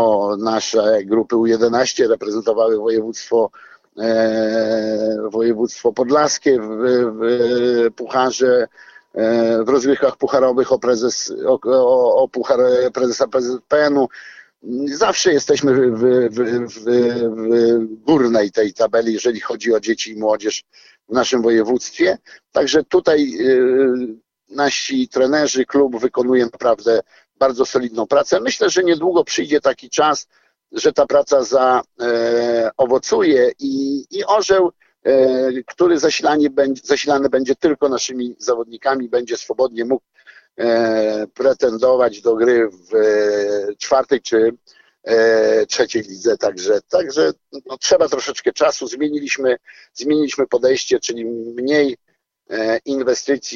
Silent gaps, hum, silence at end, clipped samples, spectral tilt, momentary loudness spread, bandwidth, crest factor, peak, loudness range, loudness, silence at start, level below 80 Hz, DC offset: none; none; 0 s; under 0.1%; -3.5 dB/octave; 7 LU; 7.4 kHz; 14 dB; -2 dBFS; 3 LU; -17 LUFS; 0 s; -60 dBFS; under 0.1%